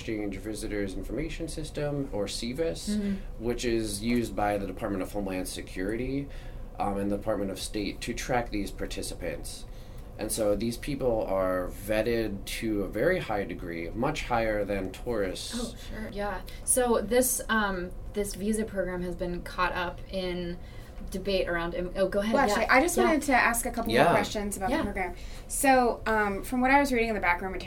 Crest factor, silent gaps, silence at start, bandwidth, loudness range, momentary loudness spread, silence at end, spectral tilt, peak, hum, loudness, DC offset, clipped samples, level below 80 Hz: 22 dB; none; 0 s; 16.5 kHz; 7 LU; 12 LU; 0 s; -4 dB/octave; -6 dBFS; none; -29 LUFS; under 0.1%; under 0.1%; -40 dBFS